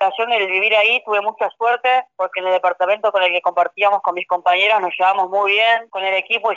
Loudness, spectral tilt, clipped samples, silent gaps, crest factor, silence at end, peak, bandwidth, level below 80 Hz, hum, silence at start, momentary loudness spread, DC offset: -16 LUFS; -2.5 dB/octave; under 0.1%; none; 14 dB; 0 s; -4 dBFS; 7.4 kHz; -76 dBFS; none; 0 s; 6 LU; under 0.1%